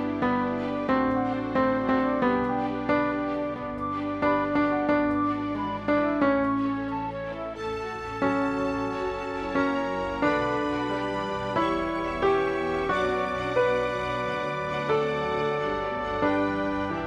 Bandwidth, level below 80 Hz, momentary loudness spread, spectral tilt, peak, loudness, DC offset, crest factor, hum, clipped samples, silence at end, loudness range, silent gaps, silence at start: 9.4 kHz; -48 dBFS; 6 LU; -6.5 dB/octave; -12 dBFS; -27 LUFS; under 0.1%; 14 dB; none; under 0.1%; 0 s; 2 LU; none; 0 s